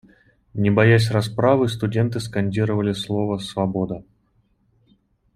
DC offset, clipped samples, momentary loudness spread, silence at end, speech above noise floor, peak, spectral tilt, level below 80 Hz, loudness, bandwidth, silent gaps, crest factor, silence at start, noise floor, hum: under 0.1%; under 0.1%; 10 LU; 1.35 s; 44 dB; -2 dBFS; -7 dB/octave; -54 dBFS; -21 LUFS; 12.5 kHz; none; 18 dB; 0.55 s; -63 dBFS; none